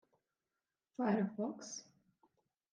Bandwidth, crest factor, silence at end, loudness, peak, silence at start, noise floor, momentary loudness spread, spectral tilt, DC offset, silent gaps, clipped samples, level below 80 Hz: 9.4 kHz; 20 dB; 0.9 s; -39 LUFS; -22 dBFS; 1 s; under -90 dBFS; 14 LU; -5.5 dB/octave; under 0.1%; none; under 0.1%; -90 dBFS